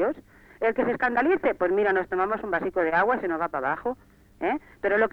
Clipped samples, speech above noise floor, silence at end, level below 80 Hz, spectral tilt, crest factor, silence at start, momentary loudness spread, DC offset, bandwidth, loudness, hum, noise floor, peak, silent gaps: under 0.1%; 23 dB; 0.05 s; -56 dBFS; -7.5 dB/octave; 16 dB; 0 s; 7 LU; under 0.1%; 5.8 kHz; -25 LUFS; none; -48 dBFS; -10 dBFS; none